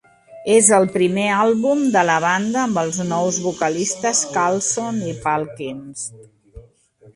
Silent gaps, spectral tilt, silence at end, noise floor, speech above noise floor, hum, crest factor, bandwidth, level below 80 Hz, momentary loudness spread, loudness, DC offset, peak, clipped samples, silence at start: none; -3.5 dB/octave; 0.55 s; -51 dBFS; 33 dB; none; 20 dB; 11.5 kHz; -56 dBFS; 16 LU; -18 LUFS; under 0.1%; 0 dBFS; under 0.1%; 0.3 s